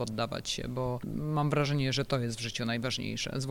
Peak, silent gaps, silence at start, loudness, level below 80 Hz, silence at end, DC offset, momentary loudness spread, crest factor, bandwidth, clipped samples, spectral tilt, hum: -18 dBFS; none; 0 s; -32 LUFS; -52 dBFS; 0 s; under 0.1%; 6 LU; 14 dB; 16.5 kHz; under 0.1%; -5 dB/octave; none